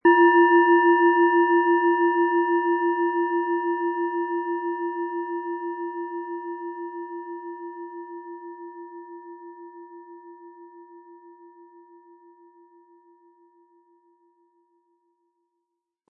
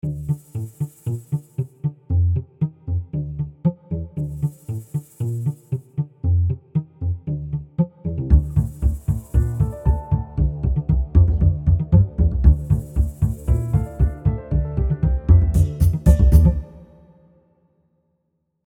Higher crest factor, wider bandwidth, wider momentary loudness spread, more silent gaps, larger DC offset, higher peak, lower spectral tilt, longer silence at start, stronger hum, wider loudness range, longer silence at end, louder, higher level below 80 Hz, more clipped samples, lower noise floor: about the same, 18 dB vs 20 dB; second, 3 kHz vs 13.5 kHz; first, 25 LU vs 12 LU; neither; neither; second, -6 dBFS vs 0 dBFS; second, -7 dB/octave vs -10 dB/octave; about the same, 0.05 s vs 0.05 s; neither; first, 24 LU vs 7 LU; first, 4.8 s vs 1.85 s; about the same, -22 LUFS vs -21 LUFS; second, -84 dBFS vs -24 dBFS; neither; first, -82 dBFS vs -72 dBFS